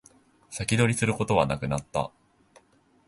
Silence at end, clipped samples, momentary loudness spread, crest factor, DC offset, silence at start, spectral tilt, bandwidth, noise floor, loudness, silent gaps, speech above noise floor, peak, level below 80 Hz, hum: 1 s; under 0.1%; 11 LU; 22 dB; under 0.1%; 0.5 s; -5 dB/octave; 12 kHz; -61 dBFS; -26 LUFS; none; 35 dB; -8 dBFS; -50 dBFS; none